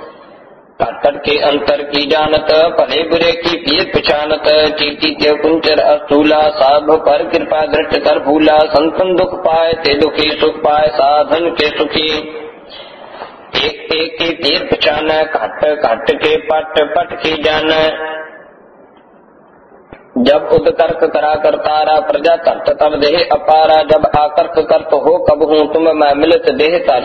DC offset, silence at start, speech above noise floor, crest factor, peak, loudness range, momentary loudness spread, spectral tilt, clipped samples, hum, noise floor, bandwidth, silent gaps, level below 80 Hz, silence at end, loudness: under 0.1%; 0 s; 32 dB; 12 dB; 0 dBFS; 5 LU; 6 LU; -5.5 dB/octave; under 0.1%; none; -43 dBFS; 6.4 kHz; none; -40 dBFS; 0 s; -12 LUFS